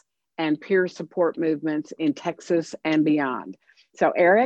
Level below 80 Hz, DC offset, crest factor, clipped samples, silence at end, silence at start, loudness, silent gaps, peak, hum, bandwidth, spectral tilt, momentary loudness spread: -76 dBFS; under 0.1%; 16 dB; under 0.1%; 0 s; 0.4 s; -24 LUFS; none; -8 dBFS; none; 8.2 kHz; -6 dB/octave; 9 LU